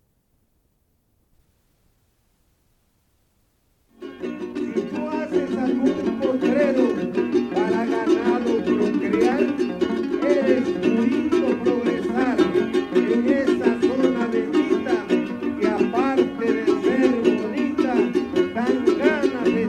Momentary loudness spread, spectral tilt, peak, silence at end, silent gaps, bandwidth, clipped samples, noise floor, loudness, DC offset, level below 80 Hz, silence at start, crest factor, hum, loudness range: 5 LU; -6.5 dB/octave; -4 dBFS; 0 s; none; 9.8 kHz; under 0.1%; -66 dBFS; -21 LUFS; under 0.1%; -56 dBFS; 4 s; 18 dB; none; 6 LU